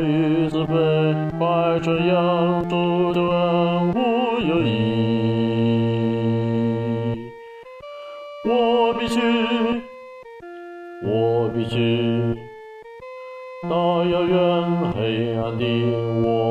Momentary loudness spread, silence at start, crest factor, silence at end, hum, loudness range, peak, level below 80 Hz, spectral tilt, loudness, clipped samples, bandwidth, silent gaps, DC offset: 18 LU; 0 s; 12 dB; 0 s; none; 4 LU; -8 dBFS; -50 dBFS; -8 dB/octave; -21 LUFS; under 0.1%; 9.6 kHz; none; under 0.1%